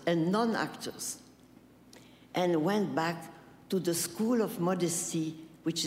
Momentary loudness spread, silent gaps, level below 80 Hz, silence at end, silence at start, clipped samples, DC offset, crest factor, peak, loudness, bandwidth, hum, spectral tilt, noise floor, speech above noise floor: 10 LU; none; -72 dBFS; 0 s; 0 s; under 0.1%; under 0.1%; 16 dB; -16 dBFS; -32 LUFS; 16 kHz; none; -4.5 dB/octave; -58 dBFS; 27 dB